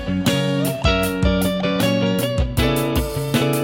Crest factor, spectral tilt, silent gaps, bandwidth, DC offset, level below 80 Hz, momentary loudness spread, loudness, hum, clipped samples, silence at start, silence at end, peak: 16 dB; -5.5 dB/octave; none; 16.5 kHz; under 0.1%; -28 dBFS; 2 LU; -19 LUFS; none; under 0.1%; 0 s; 0 s; -4 dBFS